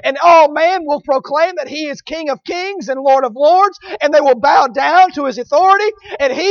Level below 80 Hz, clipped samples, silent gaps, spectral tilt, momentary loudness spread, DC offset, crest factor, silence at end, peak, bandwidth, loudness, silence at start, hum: -56 dBFS; under 0.1%; none; -3 dB/octave; 12 LU; under 0.1%; 12 dB; 0 s; 0 dBFS; 7 kHz; -13 LUFS; 0.05 s; none